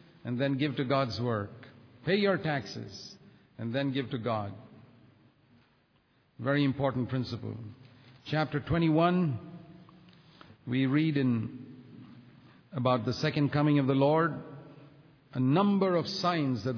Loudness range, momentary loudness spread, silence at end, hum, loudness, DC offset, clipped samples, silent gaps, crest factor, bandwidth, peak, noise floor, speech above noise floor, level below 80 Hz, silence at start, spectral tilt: 7 LU; 21 LU; 0 s; none; -30 LUFS; under 0.1%; under 0.1%; none; 18 dB; 5.4 kHz; -14 dBFS; -68 dBFS; 39 dB; -62 dBFS; 0.25 s; -7.5 dB/octave